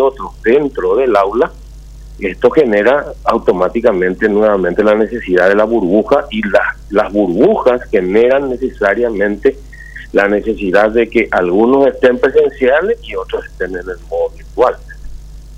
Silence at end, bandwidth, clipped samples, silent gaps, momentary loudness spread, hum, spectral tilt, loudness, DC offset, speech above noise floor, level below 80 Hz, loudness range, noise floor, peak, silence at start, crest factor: 0 s; 9.6 kHz; under 0.1%; none; 10 LU; none; -7 dB/octave; -13 LUFS; under 0.1%; 20 dB; -34 dBFS; 2 LU; -32 dBFS; 0 dBFS; 0 s; 12 dB